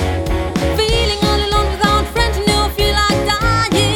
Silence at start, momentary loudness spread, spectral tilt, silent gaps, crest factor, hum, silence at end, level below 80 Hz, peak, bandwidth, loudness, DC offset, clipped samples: 0 s; 4 LU; -4.5 dB/octave; none; 14 dB; none; 0 s; -22 dBFS; 0 dBFS; 19 kHz; -15 LUFS; under 0.1%; under 0.1%